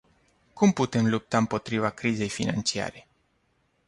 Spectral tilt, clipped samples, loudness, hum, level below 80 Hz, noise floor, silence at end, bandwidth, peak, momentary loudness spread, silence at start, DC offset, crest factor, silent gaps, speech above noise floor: -5 dB/octave; under 0.1%; -26 LUFS; none; -58 dBFS; -70 dBFS; 0.9 s; 11.5 kHz; -8 dBFS; 5 LU; 0.55 s; under 0.1%; 18 dB; none; 44 dB